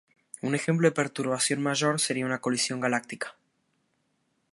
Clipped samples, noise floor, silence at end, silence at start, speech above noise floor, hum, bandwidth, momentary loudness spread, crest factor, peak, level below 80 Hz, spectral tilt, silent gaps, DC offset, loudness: under 0.1%; -74 dBFS; 1.2 s; 0.45 s; 47 dB; none; 11.5 kHz; 13 LU; 22 dB; -8 dBFS; -76 dBFS; -4 dB/octave; none; under 0.1%; -27 LUFS